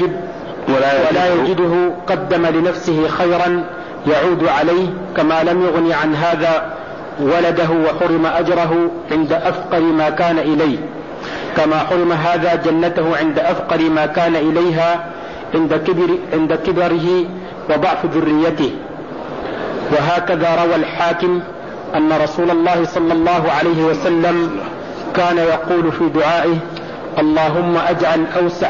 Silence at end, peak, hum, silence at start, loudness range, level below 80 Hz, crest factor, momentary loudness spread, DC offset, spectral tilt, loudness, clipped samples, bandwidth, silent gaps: 0 s; -4 dBFS; none; 0 s; 2 LU; -48 dBFS; 10 dB; 9 LU; 0.5%; -7 dB/octave; -15 LUFS; under 0.1%; 7.2 kHz; none